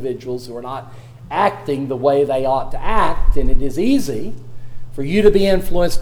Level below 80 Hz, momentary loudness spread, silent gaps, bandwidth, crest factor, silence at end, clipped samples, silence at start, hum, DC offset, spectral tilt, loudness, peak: -22 dBFS; 16 LU; none; 14.5 kHz; 14 dB; 0 s; under 0.1%; 0 s; none; under 0.1%; -6 dB/octave; -19 LUFS; 0 dBFS